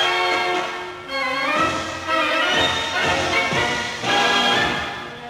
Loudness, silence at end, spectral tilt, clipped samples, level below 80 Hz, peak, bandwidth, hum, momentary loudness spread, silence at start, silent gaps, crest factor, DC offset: -19 LUFS; 0 s; -2.5 dB/octave; under 0.1%; -50 dBFS; -8 dBFS; 16.5 kHz; none; 9 LU; 0 s; none; 14 dB; under 0.1%